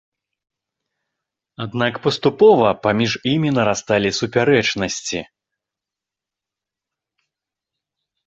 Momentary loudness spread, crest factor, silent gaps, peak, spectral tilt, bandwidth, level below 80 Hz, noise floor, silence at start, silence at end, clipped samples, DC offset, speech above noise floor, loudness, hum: 12 LU; 20 dB; none; 0 dBFS; -5 dB/octave; 8 kHz; -54 dBFS; -87 dBFS; 1.6 s; 3.05 s; under 0.1%; under 0.1%; 69 dB; -17 LUFS; none